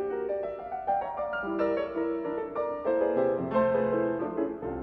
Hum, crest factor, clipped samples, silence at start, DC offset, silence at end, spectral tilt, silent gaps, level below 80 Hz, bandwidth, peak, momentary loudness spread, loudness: none; 16 dB; under 0.1%; 0 s; under 0.1%; 0 s; -9.5 dB/octave; none; -58 dBFS; 5.6 kHz; -12 dBFS; 7 LU; -30 LUFS